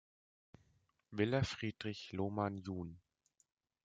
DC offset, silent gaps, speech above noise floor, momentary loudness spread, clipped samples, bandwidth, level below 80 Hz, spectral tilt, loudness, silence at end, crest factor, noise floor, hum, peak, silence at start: under 0.1%; none; 37 dB; 11 LU; under 0.1%; 9.2 kHz; -68 dBFS; -6.5 dB/octave; -40 LUFS; 0.85 s; 22 dB; -77 dBFS; none; -20 dBFS; 1.1 s